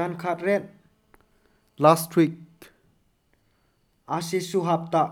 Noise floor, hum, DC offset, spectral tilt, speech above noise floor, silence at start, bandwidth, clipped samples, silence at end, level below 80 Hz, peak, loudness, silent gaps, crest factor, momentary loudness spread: -67 dBFS; none; under 0.1%; -6 dB/octave; 44 dB; 0 s; 18.5 kHz; under 0.1%; 0 s; -70 dBFS; -2 dBFS; -24 LUFS; none; 24 dB; 12 LU